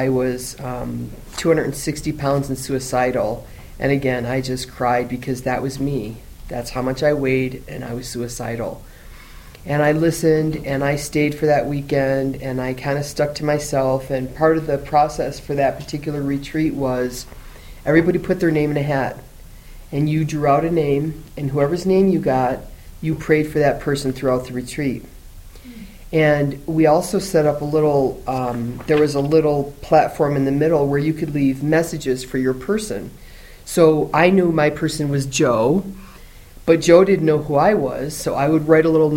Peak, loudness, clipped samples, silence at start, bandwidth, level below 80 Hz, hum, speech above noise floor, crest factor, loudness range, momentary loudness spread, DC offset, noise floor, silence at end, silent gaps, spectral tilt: 0 dBFS; -19 LUFS; under 0.1%; 0 s; 16.5 kHz; -40 dBFS; none; 22 dB; 18 dB; 5 LU; 12 LU; under 0.1%; -41 dBFS; 0 s; none; -6 dB/octave